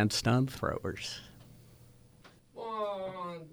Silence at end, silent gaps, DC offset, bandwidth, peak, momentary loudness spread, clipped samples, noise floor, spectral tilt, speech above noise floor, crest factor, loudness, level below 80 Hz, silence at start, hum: 0 s; none; under 0.1%; over 20 kHz; -16 dBFS; 22 LU; under 0.1%; -59 dBFS; -5 dB/octave; 28 dB; 20 dB; -34 LUFS; -58 dBFS; 0 s; none